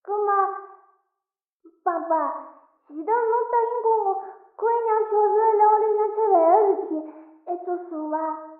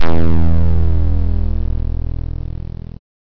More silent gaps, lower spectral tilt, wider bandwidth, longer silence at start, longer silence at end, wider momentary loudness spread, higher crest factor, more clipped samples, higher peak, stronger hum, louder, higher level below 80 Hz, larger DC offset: first, 1.55-1.60 s vs none; second, -4 dB/octave vs -10 dB/octave; second, 2.6 kHz vs 5.4 kHz; about the same, 0.05 s vs 0 s; second, 0.05 s vs 0.35 s; about the same, 16 LU vs 14 LU; first, 18 dB vs 8 dB; neither; second, -6 dBFS vs -2 dBFS; neither; second, -22 LUFS vs -19 LUFS; second, -80 dBFS vs -20 dBFS; neither